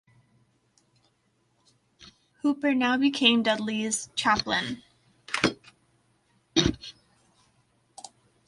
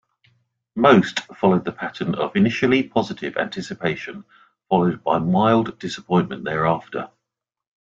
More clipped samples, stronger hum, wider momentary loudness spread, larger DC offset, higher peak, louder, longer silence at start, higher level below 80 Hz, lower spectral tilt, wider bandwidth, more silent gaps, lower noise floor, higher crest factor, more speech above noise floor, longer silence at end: neither; neither; first, 25 LU vs 14 LU; neither; second, -6 dBFS vs -2 dBFS; second, -25 LUFS vs -20 LUFS; first, 2 s vs 0.75 s; about the same, -54 dBFS vs -58 dBFS; second, -3 dB/octave vs -6.5 dB/octave; first, 11.5 kHz vs 7.6 kHz; neither; second, -70 dBFS vs -84 dBFS; about the same, 24 dB vs 20 dB; second, 45 dB vs 64 dB; first, 1.55 s vs 0.9 s